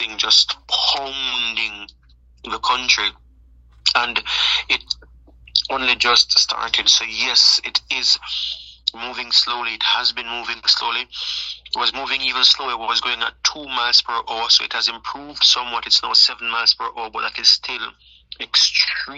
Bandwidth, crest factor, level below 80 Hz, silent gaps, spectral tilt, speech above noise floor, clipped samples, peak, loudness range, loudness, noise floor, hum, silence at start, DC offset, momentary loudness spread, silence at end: 9.6 kHz; 20 dB; -52 dBFS; none; 1.5 dB/octave; 30 dB; under 0.1%; 0 dBFS; 4 LU; -17 LUFS; -49 dBFS; none; 0 s; under 0.1%; 12 LU; 0 s